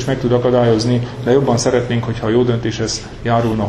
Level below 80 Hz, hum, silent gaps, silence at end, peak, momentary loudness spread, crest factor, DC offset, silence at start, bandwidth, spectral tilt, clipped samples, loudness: -38 dBFS; none; none; 0 s; 0 dBFS; 6 LU; 16 dB; under 0.1%; 0 s; 10.5 kHz; -6 dB/octave; under 0.1%; -16 LUFS